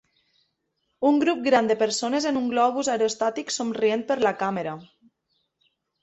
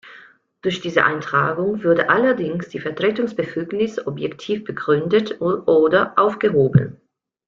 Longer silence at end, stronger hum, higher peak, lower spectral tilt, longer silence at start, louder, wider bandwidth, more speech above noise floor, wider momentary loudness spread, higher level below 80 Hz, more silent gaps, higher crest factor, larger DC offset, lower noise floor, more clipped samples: first, 1.2 s vs 0.55 s; neither; second, -8 dBFS vs -2 dBFS; second, -3.5 dB/octave vs -7 dB/octave; first, 1 s vs 0.05 s; second, -24 LUFS vs -19 LUFS; first, 8.4 kHz vs 7.4 kHz; first, 53 dB vs 29 dB; second, 7 LU vs 10 LU; second, -68 dBFS vs -56 dBFS; neither; about the same, 18 dB vs 18 dB; neither; first, -76 dBFS vs -48 dBFS; neither